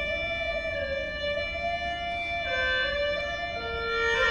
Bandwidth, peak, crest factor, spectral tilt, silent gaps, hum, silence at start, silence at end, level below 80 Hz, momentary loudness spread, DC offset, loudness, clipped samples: 10.5 kHz; -12 dBFS; 18 dB; -3.5 dB/octave; none; none; 0 s; 0 s; -44 dBFS; 5 LU; 0.1%; -28 LUFS; under 0.1%